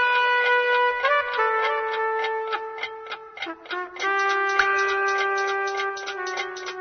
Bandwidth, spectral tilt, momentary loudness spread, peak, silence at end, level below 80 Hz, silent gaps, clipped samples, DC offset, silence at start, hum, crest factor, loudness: 6.6 kHz; -1 dB/octave; 12 LU; -6 dBFS; 0 s; -68 dBFS; none; under 0.1%; under 0.1%; 0 s; none; 18 dB; -23 LUFS